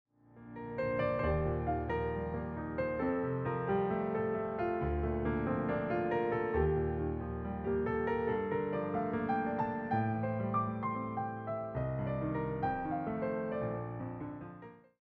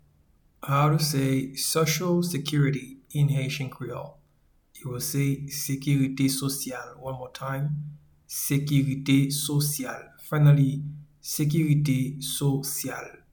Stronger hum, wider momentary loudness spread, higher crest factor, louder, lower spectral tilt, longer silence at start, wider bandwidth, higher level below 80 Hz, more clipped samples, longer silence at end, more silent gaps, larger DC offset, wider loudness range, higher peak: neither; second, 6 LU vs 14 LU; about the same, 16 dB vs 18 dB; second, -35 LUFS vs -26 LUFS; first, -7.5 dB/octave vs -5.5 dB/octave; second, 0.35 s vs 0.6 s; second, 5.2 kHz vs 19.5 kHz; first, -50 dBFS vs -58 dBFS; neither; about the same, 0.25 s vs 0.2 s; neither; neither; about the same, 3 LU vs 4 LU; second, -20 dBFS vs -8 dBFS